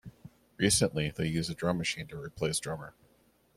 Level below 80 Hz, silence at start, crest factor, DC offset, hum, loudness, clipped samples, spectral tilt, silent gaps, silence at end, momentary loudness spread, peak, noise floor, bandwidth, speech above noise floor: -56 dBFS; 0.05 s; 22 dB; under 0.1%; none; -31 LUFS; under 0.1%; -4 dB/octave; none; 0.65 s; 16 LU; -12 dBFS; -67 dBFS; 16 kHz; 35 dB